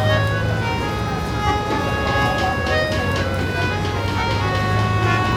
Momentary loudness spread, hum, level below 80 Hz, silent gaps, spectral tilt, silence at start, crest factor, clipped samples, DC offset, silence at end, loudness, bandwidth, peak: 4 LU; none; -32 dBFS; none; -5.5 dB/octave; 0 s; 14 dB; under 0.1%; under 0.1%; 0 s; -20 LUFS; 15.5 kHz; -4 dBFS